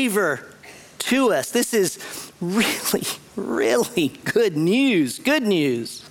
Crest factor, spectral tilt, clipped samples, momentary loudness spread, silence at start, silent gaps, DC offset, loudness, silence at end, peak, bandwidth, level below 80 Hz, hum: 16 dB; -4 dB/octave; under 0.1%; 11 LU; 0 s; none; under 0.1%; -21 LUFS; 0 s; -6 dBFS; 18 kHz; -62 dBFS; none